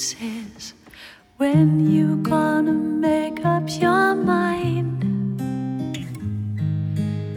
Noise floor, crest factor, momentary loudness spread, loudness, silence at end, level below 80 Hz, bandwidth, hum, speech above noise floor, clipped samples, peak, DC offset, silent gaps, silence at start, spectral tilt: -45 dBFS; 14 dB; 12 LU; -21 LUFS; 0 s; -56 dBFS; 16 kHz; none; 25 dB; under 0.1%; -6 dBFS; under 0.1%; none; 0 s; -6.5 dB/octave